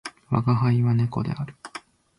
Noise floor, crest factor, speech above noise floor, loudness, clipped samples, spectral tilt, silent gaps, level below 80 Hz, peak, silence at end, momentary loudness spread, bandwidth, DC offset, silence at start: -44 dBFS; 16 dB; 22 dB; -24 LUFS; under 0.1%; -8 dB/octave; none; -54 dBFS; -8 dBFS; 0.4 s; 19 LU; 11 kHz; under 0.1%; 0.05 s